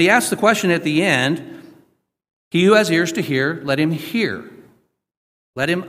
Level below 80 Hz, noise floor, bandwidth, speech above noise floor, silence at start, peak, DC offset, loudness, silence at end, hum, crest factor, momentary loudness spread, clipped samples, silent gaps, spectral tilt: -62 dBFS; -59 dBFS; 16 kHz; 42 dB; 0 s; 0 dBFS; under 0.1%; -18 LUFS; 0 s; none; 18 dB; 10 LU; under 0.1%; 2.33-2.51 s, 5.17-5.54 s; -4.5 dB/octave